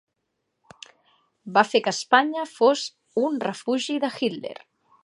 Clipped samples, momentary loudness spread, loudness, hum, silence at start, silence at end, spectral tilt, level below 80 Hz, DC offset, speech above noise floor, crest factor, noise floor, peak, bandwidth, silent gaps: under 0.1%; 9 LU; -23 LUFS; none; 1.45 s; 0.5 s; -3.5 dB/octave; -80 dBFS; under 0.1%; 55 dB; 22 dB; -78 dBFS; -2 dBFS; 11.5 kHz; none